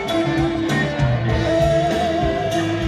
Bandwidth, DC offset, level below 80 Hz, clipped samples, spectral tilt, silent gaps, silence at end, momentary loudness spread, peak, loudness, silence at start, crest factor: 14 kHz; under 0.1%; -32 dBFS; under 0.1%; -6.5 dB/octave; none; 0 s; 3 LU; -6 dBFS; -19 LUFS; 0 s; 12 dB